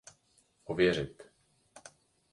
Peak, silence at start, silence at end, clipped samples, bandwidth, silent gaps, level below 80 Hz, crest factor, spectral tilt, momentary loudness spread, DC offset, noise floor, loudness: -14 dBFS; 0.7 s; 0.55 s; under 0.1%; 11.5 kHz; none; -62 dBFS; 22 dB; -5.5 dB/octave; 25 LU; under 0.1%; -70 dBFS; -31 LUFS